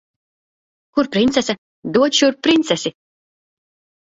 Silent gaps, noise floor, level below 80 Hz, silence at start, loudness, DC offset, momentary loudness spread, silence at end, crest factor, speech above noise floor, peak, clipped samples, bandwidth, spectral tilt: 1.58-1.82 s; under -90 dBFS; -56 dBFS; 0.95 s; -17 LUFS; under 0.1%; 10 LU; 1.25 s; 18 dB; over 74 dB; -2 dBFS; under 0.1%; 8 kHz; -3.5 dB/octave